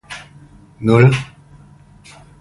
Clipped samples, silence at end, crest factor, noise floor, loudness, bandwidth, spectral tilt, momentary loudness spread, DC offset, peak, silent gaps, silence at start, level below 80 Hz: under 0.1%; 1.15 s; 18 dB; -45 dBFS; -14 LUFS; 11.5 kHz; -7.5 dB/octave; 22 LU; under 0.1%; 0 dBFS; none; 0.1 s; -46 dBFS